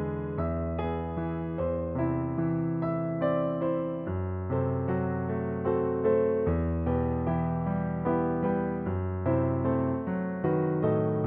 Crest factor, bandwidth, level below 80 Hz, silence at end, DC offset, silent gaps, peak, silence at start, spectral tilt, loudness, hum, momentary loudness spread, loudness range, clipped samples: 14 dB; 3.6 kHz; -46 dBFS; 0 s; under 0.1%; none; -14 dBFS; 0 s; -9.5 dB/octave; -29 LUFS; none; 5 LU; 2 LU; under 0.1%